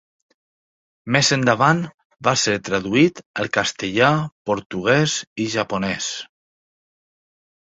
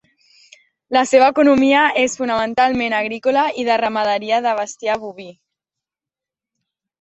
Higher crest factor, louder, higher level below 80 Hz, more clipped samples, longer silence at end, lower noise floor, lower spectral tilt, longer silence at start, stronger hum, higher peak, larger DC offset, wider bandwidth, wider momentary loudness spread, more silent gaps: about the same, 20 dB vs 18 dB; second, -20 LUFS vs -16 LUFS; about the same, -56 dBFS vs -58 dBFS; neither; second, 1.5 s vs 1.7 s; about the same, under -90 dBFS vs -88 dBFS; about the same, -4 dB/octave vs -3.5 dB/octave; first, 1.05 s vs 0.9 s; neither; about the same, -2 dBFS vs -2 dBFS; neither; about the same, 8.4 kHz vs 8.4 kHz; about the same, 10 LU vs 10 LU; first, 1.94-1.98 s, 2.05-2.10 s, 3.26-3.34 s, 4.32-4.45 s, 4.66-4.70 s, 5.27-5.36 s vs none